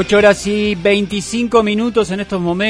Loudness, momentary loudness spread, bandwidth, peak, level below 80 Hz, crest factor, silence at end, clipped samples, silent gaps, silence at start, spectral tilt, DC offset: -15 LUFS; 8 LU; 11 kHz; 0 dBFS; -40 dBFS; 14 dB; 0 s; under 0.1%; none; 0 s; -5 dB/octave; under 0.1%